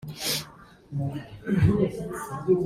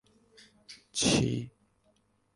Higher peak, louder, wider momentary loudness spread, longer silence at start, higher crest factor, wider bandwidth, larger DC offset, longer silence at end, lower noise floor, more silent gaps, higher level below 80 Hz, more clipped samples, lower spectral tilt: first, -8 dBFS vs -12 dBFS; about the same, -28 LUFS vs -29 LUFS; second, 13 LU vs 25 LU; second, 0 s vs 0.7 s; about the same, 18 dB vs 22 dB; first, 16 kHz vs 11.5 kHz; neither; second, 0 s vs 0.85 s; second, -49 dBFS vs -70 dBFS; neither; first, -46 dBFS vs -54 dBFS; neither; first, -5.5 dB/octave vs -4 dB/octave